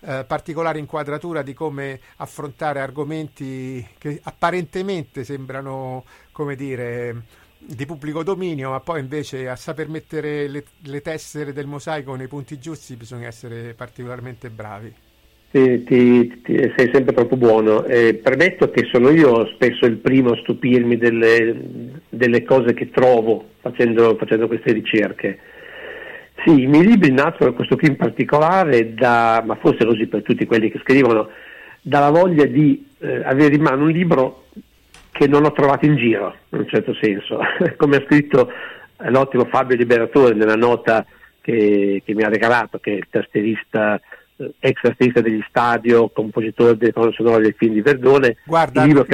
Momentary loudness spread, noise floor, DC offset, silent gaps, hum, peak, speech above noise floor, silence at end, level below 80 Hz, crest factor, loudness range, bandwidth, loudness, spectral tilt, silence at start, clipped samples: 19 LU; -49 dBFS; under 0.1%; none; none; -4 dBFS; 32 dB; 0 s; -54 dBFS; 14 dB; 13 LU; 12.5 kHz; -16 LUFS; -7.5 dB/octave; 0.05 s; under 0.1%